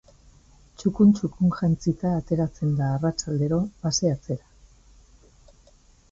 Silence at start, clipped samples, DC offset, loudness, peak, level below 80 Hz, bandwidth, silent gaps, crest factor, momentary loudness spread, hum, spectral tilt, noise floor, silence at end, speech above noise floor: 0.8 s; under 0.1%; under 0.1%; -24 LUFS; -8 dBFS; -50 dBFS; 7.6 kHz; none; 16 dB; 9 LU; none; -6.5 dB/octave; -56 dBFS; 1.75 s; 33 dB